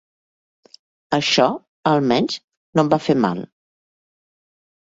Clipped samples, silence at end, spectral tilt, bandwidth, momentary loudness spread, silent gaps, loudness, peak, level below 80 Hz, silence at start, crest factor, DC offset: under 0.1%; 1.45 s; -5 dB/octave; 8 kHz; 10 LU; 1.68-1.83 s, 2.44-2.48 s, 2.57-2.73 s; -19 LUFS; -2 dBFS; -60 dBFS; 1.1 s; 20 dB; under 0.1%